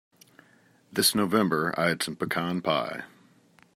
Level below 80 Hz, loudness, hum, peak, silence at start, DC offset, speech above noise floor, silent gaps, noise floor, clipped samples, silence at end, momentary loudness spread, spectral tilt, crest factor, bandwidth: -68 dBFS; -26 LUFS; none; -8 dBFS; 0.9 s; under 0.1%; 34 dB; none; -61 dBFS; under 0.1%; 0.7 s; 10 LU; -3.5 dB/octave; 20 dB; 16 kHz